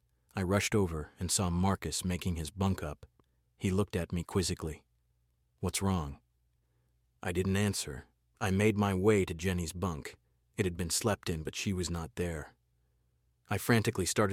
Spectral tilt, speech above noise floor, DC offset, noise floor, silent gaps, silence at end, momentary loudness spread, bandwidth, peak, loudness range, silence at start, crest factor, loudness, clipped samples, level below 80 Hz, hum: -5 dB/octave; 42 dB; under 0.1%; -74 dBFS; none; 0 s; 13 LU; 16.5 kHz; -14 dBFS; 5 LU; 0.35 s; 20 dB; -33 LUFS; under 0.1%; -54 dBFS; none